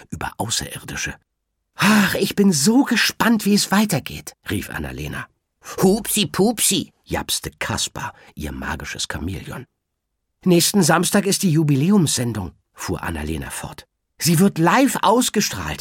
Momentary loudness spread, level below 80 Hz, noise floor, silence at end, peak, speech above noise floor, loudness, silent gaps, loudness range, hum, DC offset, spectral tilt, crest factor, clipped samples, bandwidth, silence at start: 16 LU; -42 dBFS; -76 dBFS; 0.05 s; -2 dBFS; 57 dB; -19 LUFS; none; 5 LU; none; under 0.1%; -4 dB/octave; 18 dB; under 0.1%; 17.5 kHz; 0 s